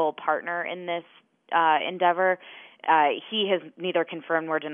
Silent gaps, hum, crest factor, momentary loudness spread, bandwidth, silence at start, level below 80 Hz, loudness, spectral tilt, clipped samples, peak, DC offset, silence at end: none; none; 18 dB; 10 LU; 3.7 kHz; 0 s; under -90 dBFS; -25 LUFS; -7.5 dB/octave; under 0.1%; -8 dBFS; under 0.1%; 0 s